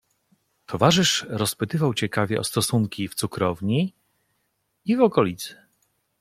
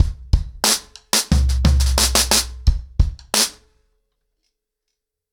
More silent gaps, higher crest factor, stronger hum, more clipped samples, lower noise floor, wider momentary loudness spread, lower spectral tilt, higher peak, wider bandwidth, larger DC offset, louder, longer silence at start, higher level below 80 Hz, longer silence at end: neither; first, 22 dB vs 16 dB; neither; neither; second, -73 dBFS vs -79 dBFS; about the same, 10 LU vs 8 LU; first, -4.5 dB/octave vs -3 dB/octave; about the same, -2 dBFS vs -4 dBFS; second, 16 kHz vs over 20 kHz; neither; second, -23 LUFS vs -18 LUFS; first, 0.7 s vs 0 s; second, -58 dBFS vs -22 dBFS; second, 0.65 s vs 1.8 s